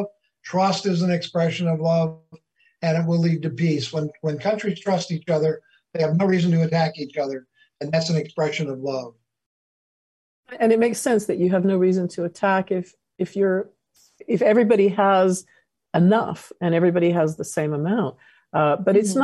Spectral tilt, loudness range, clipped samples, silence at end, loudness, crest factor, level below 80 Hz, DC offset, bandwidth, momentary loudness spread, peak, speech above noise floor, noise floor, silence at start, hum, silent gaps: -6.5 dB/octave; 4 LU; under 0.1%; 0 s; -22 LUFS; 18 dB; -68 dBFS; under 0.1%; 12.5 kHz; 11 LU; -4 dBFS; over 69 dB; under -90 dBFS; 0 s; none; 9.46-10.43 s